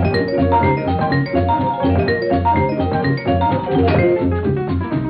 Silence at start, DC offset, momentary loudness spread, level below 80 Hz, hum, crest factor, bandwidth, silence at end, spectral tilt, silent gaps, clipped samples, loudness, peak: 0 s; under 0.1%; 3 LU; -34 dBFS; none; 12 dB; 5.4 kHz; 0 s; -10.5 dB/octave; none; under 0.1%; -17 LUFS; -4 dBFS